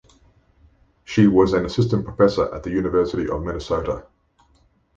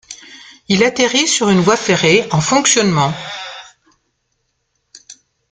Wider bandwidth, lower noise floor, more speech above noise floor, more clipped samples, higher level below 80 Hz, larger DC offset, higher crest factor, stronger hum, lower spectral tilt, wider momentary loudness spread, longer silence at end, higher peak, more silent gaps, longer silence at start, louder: second, 7.8 kHz vs 9.8 kHz; second, -60 dBFS vs -68 dBFS; second, 40 dB vs 55 dB; neither; first, -40 dBFS vs -52 dBFS; neither; about the same, 18 dB vs 16 dB; neither; first, -7.5 dB/octave vs -3.5 dB/octave; second, 10 LU vs 18 LU; first, 0.95 s vs 0.4 s; about the same, -2 dBFS vs 0 dBFS; neither; first, 1.1 s vs 0.1 s; second, -20 LUFS vs -13 LUFS